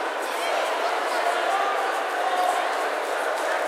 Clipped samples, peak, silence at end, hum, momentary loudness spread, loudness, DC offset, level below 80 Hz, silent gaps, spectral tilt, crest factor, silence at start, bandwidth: under 0.1%; -10 dBFS; 0 s; none; 3 LU; -24 LUFS; under 0.1%; -88 dBFS; none; 1 dB/octave; 16 dB; 0 s; 16 kHz